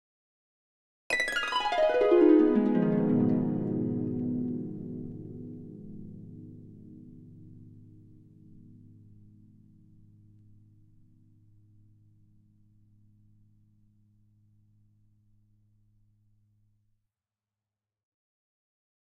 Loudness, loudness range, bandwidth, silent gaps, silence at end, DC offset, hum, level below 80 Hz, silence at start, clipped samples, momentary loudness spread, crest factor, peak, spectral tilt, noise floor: -27 LUFS; 25 LU; 12 kHz; none; 11.4 s; under 0.1%; none; -60 dBFS; 1.1 s; under 0.1%; 28 LU; 22 dB; -10 dBFS; -6.5 dB/octave; under -90 dBFS